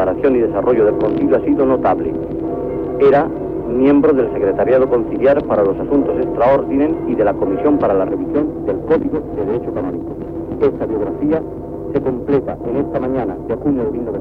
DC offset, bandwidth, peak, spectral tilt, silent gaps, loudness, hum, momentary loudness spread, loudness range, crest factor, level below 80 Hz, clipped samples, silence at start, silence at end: under 0.1%; 4.8 kHz; -4 dBFS; -10 dB/octave; none; -16 LUFS; 50 Hz at -40 dBFS; 8 LU; 5 LU; 12 dB; -38 dBFS; under 0.1%; 0 s; 0 s